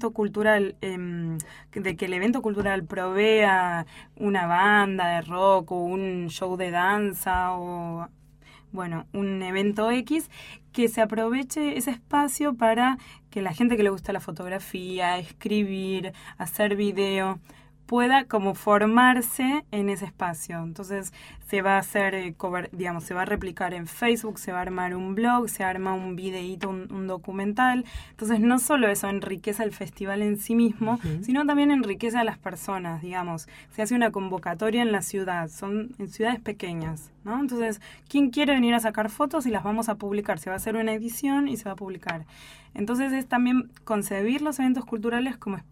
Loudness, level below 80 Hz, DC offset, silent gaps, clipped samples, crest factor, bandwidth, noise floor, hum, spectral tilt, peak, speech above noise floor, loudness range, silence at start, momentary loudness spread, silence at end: -26 LUFS; -54 dBFS; under 0.1%; none; under 0.1%; 20 dB; 16.5 kHz; -53 dBFS; none; -4.5 dB/octave; -6 dBFS; 27 dB; 5 LU; 0 s; 12 LU; 0.1 s